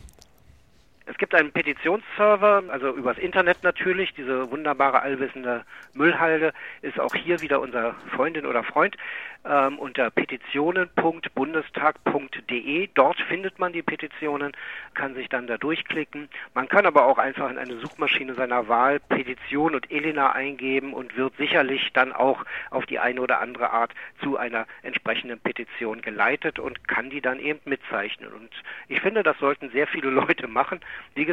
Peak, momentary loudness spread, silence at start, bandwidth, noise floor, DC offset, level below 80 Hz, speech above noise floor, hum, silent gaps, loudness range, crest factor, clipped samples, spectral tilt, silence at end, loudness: -2 dBFS; 10 LU; 0.05 s; 12 kHz; -59 dBFS; 0.1%; -64 dBFS; 34 dB; none; none; 5 LU; 24 dB; under 0.1%; -6 dB/octave; 0 s; -24 LUFS